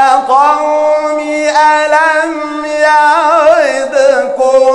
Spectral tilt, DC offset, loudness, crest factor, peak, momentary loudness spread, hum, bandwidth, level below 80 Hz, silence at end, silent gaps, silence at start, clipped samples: -1.5 dB/octave; under 0.1%; -9 LUFS; 8 dB; 0 dBFS; 6 LU; none; 11 kHz; -52 dBFS; 0 s; none; 0 s; 1%